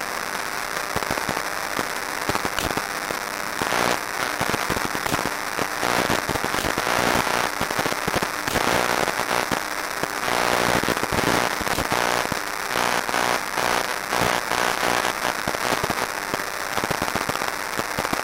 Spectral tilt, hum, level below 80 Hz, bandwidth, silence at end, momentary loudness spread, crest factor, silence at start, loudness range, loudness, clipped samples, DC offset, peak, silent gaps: -2.5 dB/octave; none; -46 dBFS; 16.5 kHz; 0 s; 5 LU; 20 dB; 0 s; 3 LU; -23 LUFS; under 0.1%; 0.1%; -4 dBFS; none